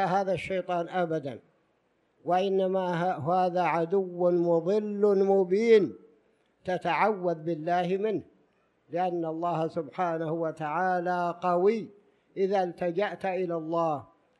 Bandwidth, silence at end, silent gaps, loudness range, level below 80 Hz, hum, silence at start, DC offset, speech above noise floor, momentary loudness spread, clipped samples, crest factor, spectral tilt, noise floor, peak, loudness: 10.5 kHz; 0.35 s; none; 5 LU; -72 dBFS; none; 0 s; under 0.1%; 44 dB; 9 LU; under 0.1%; 18 dB; -7.5 dB/octave; -71 dBFS; -10 dBFS; -28 LUFS